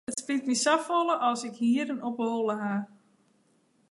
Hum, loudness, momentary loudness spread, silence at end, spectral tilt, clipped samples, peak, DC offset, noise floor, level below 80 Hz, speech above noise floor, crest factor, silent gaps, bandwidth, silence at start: none; -28 LUFS; 8 LU; 1.05 s; -3.5 dB/octave; under 0.1%; -10 dBFS; under 0.1%; -67 dBFS; -80 dBFS; 40 dB; 20 dB; none; 11.5 kHz; 0.1 s